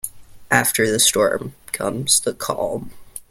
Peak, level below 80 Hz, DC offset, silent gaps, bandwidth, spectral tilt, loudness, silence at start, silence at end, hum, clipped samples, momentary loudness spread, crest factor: 0 dBFS; -52 dBFS; under 0.1%; none; 16.5 kHz; -2 dB/octave; -18 LUFS; 0.05 s; 0.1 s; none; under 0.1%; 16 LU; 20 dB